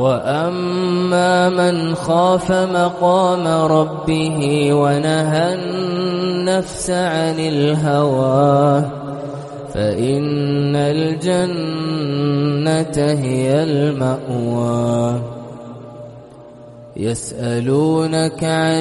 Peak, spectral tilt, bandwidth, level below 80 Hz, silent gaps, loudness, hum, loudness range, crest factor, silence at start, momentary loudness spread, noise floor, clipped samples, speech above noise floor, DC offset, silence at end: -2 dBFS; -6 dB/octave; 11.5 kHz; -48 dBFS; none; -17 LUFS; none; 6 LU; 14 dB; 0 s; 10 LU; -38 dBFS; under 0.1%; 22 dB; under 0.1%; 0 s